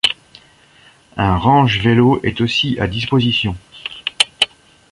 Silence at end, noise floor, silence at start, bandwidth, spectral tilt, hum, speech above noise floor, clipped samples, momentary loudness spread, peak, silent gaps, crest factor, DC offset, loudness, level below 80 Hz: 0.45 s; -48 dBFS; 0.05 s; 11.5 kHz; -5 dB/octave; none; 34 dB; under 0.1%; 13 LU; 0 dBFS; none; 16 dB; under 0.1%; -16 LUFS; -38 dBFS